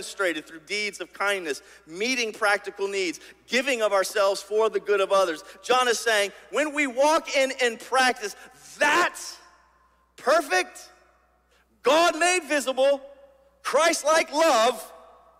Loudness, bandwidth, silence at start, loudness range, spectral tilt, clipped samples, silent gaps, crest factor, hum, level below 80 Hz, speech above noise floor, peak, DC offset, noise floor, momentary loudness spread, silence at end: -24 LUFS; 16 kHz; 0 s; 4 LU; -1 dB/octave; under 0.1%; none; 16 dB; none; -68 dBFS; 39 dB; -8 dBFS; under 0.1%; -63 dBFS; 13 LU; 0.4 s